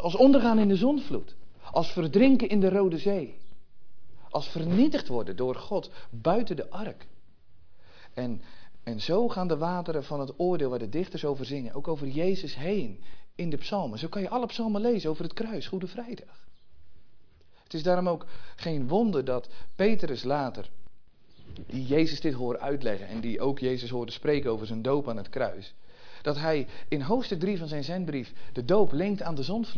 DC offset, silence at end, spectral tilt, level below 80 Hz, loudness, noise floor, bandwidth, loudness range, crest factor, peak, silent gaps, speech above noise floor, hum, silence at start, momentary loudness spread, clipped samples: under 0.1%; 0 s; -7.5 dB/octave; -56 dBFS; -29 LUFS; -55 dBFS; 5.4 kHz; 7 LU; 20 dB; -8 dBFS; none; 29 dB; none; 0 s; 14 LU; under 0.1%